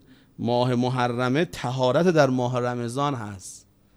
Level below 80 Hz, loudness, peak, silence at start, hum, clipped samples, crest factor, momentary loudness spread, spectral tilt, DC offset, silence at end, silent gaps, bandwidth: -58 dBFS; -24 LUFS; -4 dBFS; 0.4 s; none; under 0.1%; 20 dB; 13 LU; -6.5 dB/octave; under 0.1%; 0.4 s; none; 13.5 kHz